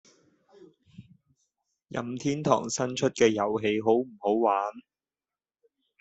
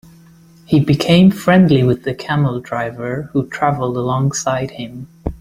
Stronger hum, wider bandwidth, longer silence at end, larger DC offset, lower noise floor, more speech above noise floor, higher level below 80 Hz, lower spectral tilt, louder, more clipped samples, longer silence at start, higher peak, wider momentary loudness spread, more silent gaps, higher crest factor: neither; second, 8.2 kHz vs 15 kHz; first, 1.2 s vs 0.05 s; neither; first, under -90 dBFS vs -45 dBFS; first, over 64 dB vs 30 dB; second, -70 dBFS vs -40 dBFS; second, -5 dB/octave vs -6.5 dB/octave; second, -27 LUFS vs -16 LUFS; neither; first, 1 s vs 0.7 s; second, -8 dBFS vs 0 dBFS; second, 11 LU vs 14 LU; neither; first, 22 dB vs 16 dB